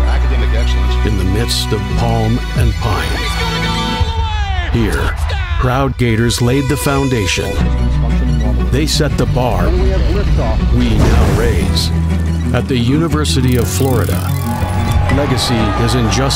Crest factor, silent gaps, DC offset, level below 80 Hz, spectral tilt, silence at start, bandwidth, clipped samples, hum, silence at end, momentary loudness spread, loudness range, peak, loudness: 12 dB; none; under 0.1%; -18 dBFS; -5.5 dB/octave; 0 s; 16.5 kHz; under 0.1%; none; 0 s; 4 LU; 2 LU; 0 dBFS; -14 LUFS